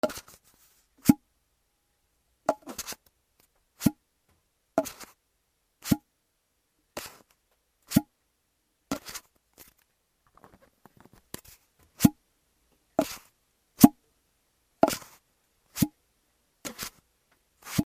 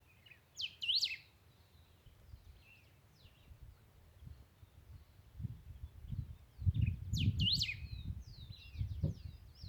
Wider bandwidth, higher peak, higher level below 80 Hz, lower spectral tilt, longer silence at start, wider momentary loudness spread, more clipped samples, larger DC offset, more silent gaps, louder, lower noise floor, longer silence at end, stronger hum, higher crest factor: second, 16 kHz vs 20 kHz; first, 0 dBFS vs -20 dBFS; second, -58 dBFS vs -52 dBFS; first, -5.5 dB/octave vs -4 dB/octave; second, 0.05 s vs 0.3 s; second, 19 LU vs 27 LU; neither; neither; neither; first, -28 LUFS vs -39 LUFS; first, -75 dBFS vs -66 dBFS; about the same, 0.05 s vs 0 s; neither; first, 32 dB vs 22 dB